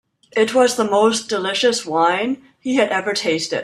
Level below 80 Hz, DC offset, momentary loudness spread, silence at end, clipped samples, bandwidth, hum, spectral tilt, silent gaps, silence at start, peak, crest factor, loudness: -64 dBFS; under 0.1%; 6 LU; 0 s; under 0.1%; 13.5 kHz; none; -3 dB/octave; none; 0.35 s; -2 dBFS; 16 dB; -18 LUFS